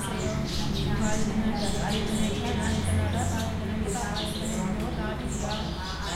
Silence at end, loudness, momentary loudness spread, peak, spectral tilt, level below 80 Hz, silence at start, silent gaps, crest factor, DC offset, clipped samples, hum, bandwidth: 0 s; -29 LUFS; 4 LU; -14 dBFS; -5 dB/octave; -38 dBFS; 0 s; none; 14 dB; under 0.1%; under 0.1%; none; 16.5 kHz